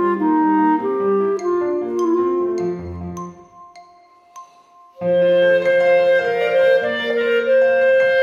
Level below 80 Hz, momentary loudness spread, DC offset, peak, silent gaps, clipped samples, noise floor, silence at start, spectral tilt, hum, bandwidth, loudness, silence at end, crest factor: -54 dBFS; 11 LU; under 0.1%; -6 dBFS; none; under 0.1%; -49 dBFS; 0 s; -6.5 dB/octave; none; 7 kHz; -17 LUFS; 0 s; 12 dB